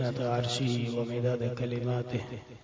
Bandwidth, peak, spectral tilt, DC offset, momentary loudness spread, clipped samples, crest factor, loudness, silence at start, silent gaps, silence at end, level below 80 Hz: 8 kHz; -18 dBFS; -6.5 dB/octave; under 0.1%; 6 LU; under 0.1%; 14 dB; -31 LUFS; 0 s; none; 0.05 s; -60 dBFS